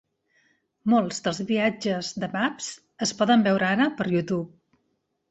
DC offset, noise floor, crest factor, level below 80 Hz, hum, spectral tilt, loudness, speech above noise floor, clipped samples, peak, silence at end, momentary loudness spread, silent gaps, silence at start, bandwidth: under 0.1%; -74 dBFS; 16 dB; -66 dBFS; none; -4.5 dB/octave; -25 LUFS; 51 dB; under 0.1%; -10 dBFS; 0.85 s; 10 LU; none; 0.85 s; 8.2 kHz